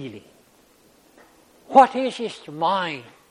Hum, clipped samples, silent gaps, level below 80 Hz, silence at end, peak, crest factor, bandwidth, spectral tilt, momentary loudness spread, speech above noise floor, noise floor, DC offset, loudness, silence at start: none; under 0.1%; none; -68 dBFS; 0.3 s; 0 dBFS; 24 dB; 11.5 kHz; -5 dB/octave; 18 LU; 35 dB; -56 dBFS; under 0.1%; -20 LUFS; 0 s